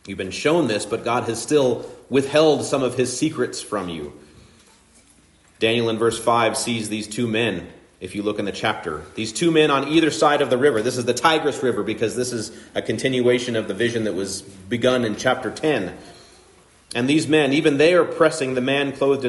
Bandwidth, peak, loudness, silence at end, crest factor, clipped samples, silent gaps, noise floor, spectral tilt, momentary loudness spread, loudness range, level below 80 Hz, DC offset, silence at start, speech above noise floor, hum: 11.5 kHz; -4 dBFS; -21 LUFS; 0 s; 18 dB; under 0.1%; none; -54 dBFS; -4.5 dB/octave; 12 LU; 5 LU; -58 dBFS; under 0.1%; 0.05 s; 34 dB; none